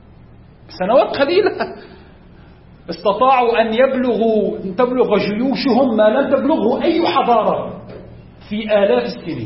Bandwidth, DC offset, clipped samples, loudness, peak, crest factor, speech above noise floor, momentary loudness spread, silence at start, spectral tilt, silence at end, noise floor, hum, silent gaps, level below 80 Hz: 5.8 kHz; under 0.1%; under 0.1%; -16 LUFS; -2 dBFS; 14 dB; 27 dB; 12 LU; 0.7 s; -10 dB/octave; 0 s; -42 dBFS; none; none; -48 dBFS